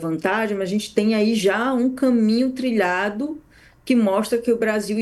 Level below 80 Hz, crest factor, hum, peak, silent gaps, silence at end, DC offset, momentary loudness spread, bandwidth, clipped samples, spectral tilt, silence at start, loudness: -58 dBFS; 16 dB; none; -4 dBFS; none; 0 s; under 0.1%; 5 LU; 12.5 kHz; under 0.1%; -5.5 dB/octave; 0 s; -20 LUFS